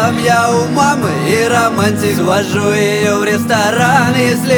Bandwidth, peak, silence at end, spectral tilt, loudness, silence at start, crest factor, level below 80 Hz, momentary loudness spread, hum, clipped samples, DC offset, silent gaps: over 20 kHz; 0 dBFS; 0 s; -4.5 dB/octave; -12 LUFS; 0 s; 12 dB; -48 dBFS; 3 LU; none; under 0.1%; under 0.1%; none